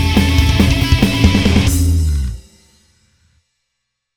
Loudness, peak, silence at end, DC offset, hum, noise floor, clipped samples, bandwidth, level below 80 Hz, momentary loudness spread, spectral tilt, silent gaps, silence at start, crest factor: -13 LUFS; 0 dBFS; 1.75 s; under 0.1%; none; -74 dBFS; under 0.1%; 19.5 kHz; -20 dBFS; 8 LU; -5.5 dB/octave; none; 0 s; 14 dB